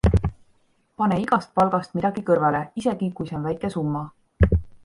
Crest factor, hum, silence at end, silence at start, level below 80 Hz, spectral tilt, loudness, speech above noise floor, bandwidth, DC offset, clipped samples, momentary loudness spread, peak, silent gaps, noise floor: 22 dB; none; 0.1 s; 0.05 s; -32 dBFS; -8.5 dB/octave; -23 LUFS; 40 dB; 11 kHz; under 0.1%; under 0.1%; 8 LU; -2 dBFS; none; -63 dBFS